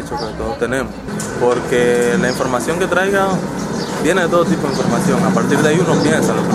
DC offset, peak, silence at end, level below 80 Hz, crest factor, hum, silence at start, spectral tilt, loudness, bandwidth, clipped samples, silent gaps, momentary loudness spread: under 0.1%; -2 dBFS; 0 s; -40 dBFS; 14 dB; none; 0 s; -5.5 dB/octave; -16 LUFS; 14.5 kHz; under 0.1%; none; 8 LU